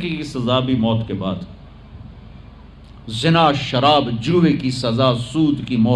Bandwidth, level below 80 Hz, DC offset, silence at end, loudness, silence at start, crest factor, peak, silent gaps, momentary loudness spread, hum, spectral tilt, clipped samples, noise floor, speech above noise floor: 11 kHz; -44 dBFS; under 0.1%; 0 s; -18 LUFS; 0 s; 18 dB; -2 dBFS; none; 11 LU; none; -6.5 dB/octave; under 0.1%; -40 dBFS; 23 dB